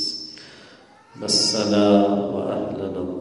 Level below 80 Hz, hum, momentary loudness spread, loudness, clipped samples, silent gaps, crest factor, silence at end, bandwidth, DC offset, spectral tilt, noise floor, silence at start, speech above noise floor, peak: -60 dBFS; none; 16 LU; -20 LUFS; under 0.1%; none; 18 dB; 0 s; 11.5 kHz; under 0.1%; -4 dB/octave; -49 dBFS; 0 s; 29 dB; -4 dBFS